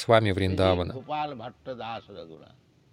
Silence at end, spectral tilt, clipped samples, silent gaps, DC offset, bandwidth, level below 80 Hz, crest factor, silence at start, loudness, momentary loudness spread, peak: 0.55 s; -6.5 dB/octave; under 0.1%; none; under 0.1%; 11 kHz; -54 dBFS; 22 dB; 0 s; -27 LUFS; 21 LU; -6 dBFS